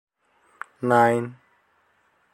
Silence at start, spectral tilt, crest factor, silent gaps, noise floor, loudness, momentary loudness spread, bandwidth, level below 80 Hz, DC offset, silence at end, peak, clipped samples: 0.8 s; -6.5 dB/octave; 22 dB; none; -65 dBFS; -21 LUFS; 23 LU; 14 kHz; -68 dBFS; under 0.1%; 1 s; -4 dBFS; under 0.1%